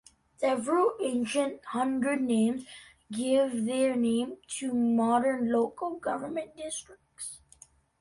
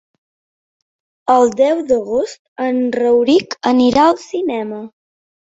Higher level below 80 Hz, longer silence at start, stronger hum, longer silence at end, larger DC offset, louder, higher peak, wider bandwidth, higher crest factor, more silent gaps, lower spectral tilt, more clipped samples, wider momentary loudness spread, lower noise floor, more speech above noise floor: second, -68 dBFS vs -54 dBFS; second, 0.4 s vs 1.25 s; neither; about the same, 0.65 s vs 0.7 s; neither; second, -29 LUFS vs -15 LUFS; second, -14 dBFS vs -2 dBFS; first, 11.5 kHz vs 8 kHz; about the same, 16 dB vs 14 dB; second, none vs 2.39-2.56 s; about the same, -4.5 dB/octave vs -4.5 dB/octave; neither; about the same, 13 LU vs 12 LU; second, -58 dBFS vs under -90 dBFS; second, 30 dB vs over 76 dB